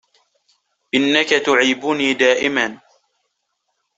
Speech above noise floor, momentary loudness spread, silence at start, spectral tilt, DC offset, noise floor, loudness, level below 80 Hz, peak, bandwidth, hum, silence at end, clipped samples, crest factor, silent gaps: 56 dB; 6 LU; 0.95 s; -2.5 dB/octave; under 0.1%; -72 dBFS; -16 LUFS; -64 dBFS; -2 dBFS; 8.2 kHz; none; 1.25 s; under 0.1%; 18 dB; none